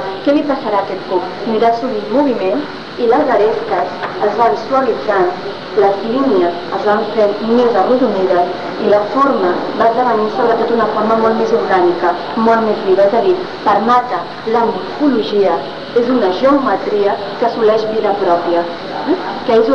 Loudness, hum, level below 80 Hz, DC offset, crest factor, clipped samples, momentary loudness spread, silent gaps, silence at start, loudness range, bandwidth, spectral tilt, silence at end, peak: -14 LUFS; none; -52 dBFS; 1%; 12 dB; under 0.1%; 6 LU; none; 0 s; 2 LU; 7.2 kHz; -6.5 dB/octave; 0 s; -2 dBFS